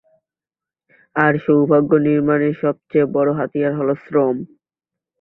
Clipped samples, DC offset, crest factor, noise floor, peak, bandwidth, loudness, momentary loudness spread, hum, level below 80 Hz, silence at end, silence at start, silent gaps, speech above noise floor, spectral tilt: under 0.1%; under 0.1%; 18 dB; -90 dBFS; 0 dBFS; 4 kHz; -17 LUFS; 7 LU; none; -60 dBFS; 0.75 s; 1.15 s; none; 73 dB; -11 dB/octave